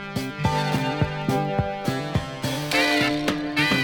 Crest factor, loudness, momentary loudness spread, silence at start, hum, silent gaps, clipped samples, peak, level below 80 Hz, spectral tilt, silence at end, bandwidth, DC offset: 16 dB; -24 LUFS; 7 LU; 0 s; none; none; under 0.1%; -8 dBFS; -46 dBFS; -5 dB/octave; 0 s; over 20 kHz; under 0.1%